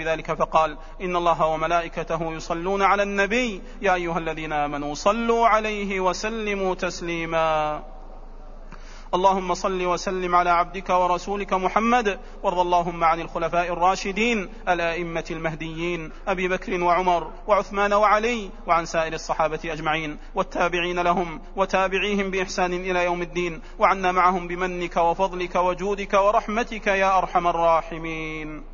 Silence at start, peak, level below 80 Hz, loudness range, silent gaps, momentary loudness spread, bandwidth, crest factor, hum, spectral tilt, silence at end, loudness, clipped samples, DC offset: 0 s; -4 dBFS; -38 dBFS; 3 LU; none; 9 LU; 7.4 kHz; 18 dB; none; -4.5 dB/octave; 0 s; -23 LUFS; under 0.1%; under 0.1%